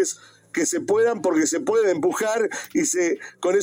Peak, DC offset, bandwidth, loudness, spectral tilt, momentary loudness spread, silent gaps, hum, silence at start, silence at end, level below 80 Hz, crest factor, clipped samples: -10 dBFS; under 0.1%; 16.5 kHz; -22 LUFS; -3 dB/octave; 6 LU; none; none; 0 s; 0 s; -72 dBFS; 12 dB; under 0.1%